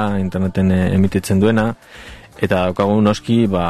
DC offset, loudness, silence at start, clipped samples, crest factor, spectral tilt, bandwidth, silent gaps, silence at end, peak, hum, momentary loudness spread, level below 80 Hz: 1%; -17 LUFS; 0 s; under 0.1%; 14 dB; -7 dB/octave; 13.5 kHz; none; 0 s; -2 dBFS; none; 17 LU; -34 dBFS